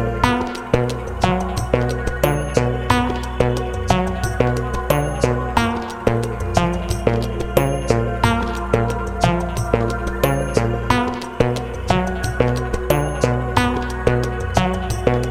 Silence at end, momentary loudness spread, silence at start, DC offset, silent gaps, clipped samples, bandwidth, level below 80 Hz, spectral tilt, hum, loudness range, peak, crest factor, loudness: 0 s; 4 LU; 0 s; under 0.1%; none; under 0.1%; 18.5 kHz; -28 dBFS; -6 dB/octave; none; 1 LU; 0 dBFS; 18 dB; -20 LUFS